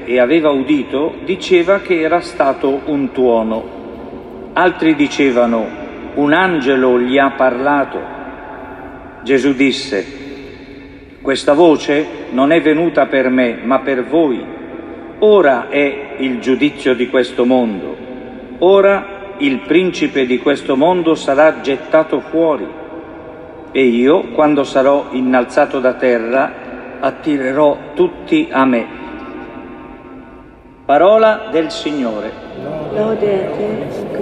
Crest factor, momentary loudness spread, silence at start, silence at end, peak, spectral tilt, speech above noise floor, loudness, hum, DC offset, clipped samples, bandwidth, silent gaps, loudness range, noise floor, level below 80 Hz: 14 dB; 19 LU; 0 s; 0 s; 0 dBFS; -5.5 dB/octave; 26 dB; -14 LUFS; none; under 0.1%; under 0.1%; 10.5 kHz; none; 3 LU; -39 dBFS; -48 dBFS